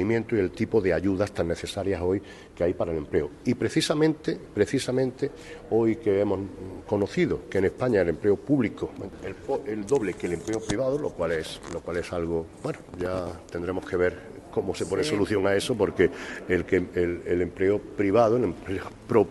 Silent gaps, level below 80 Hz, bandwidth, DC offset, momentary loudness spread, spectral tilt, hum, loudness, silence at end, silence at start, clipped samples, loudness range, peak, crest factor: none; -50 dBFS; 12.5 kHz; under 0.1%; 10 LU; -6 dB/octave; none; -27 LUFS; 0 s; 0 s; under 0.1%; 5 LU; -6 dBFS; 20 dB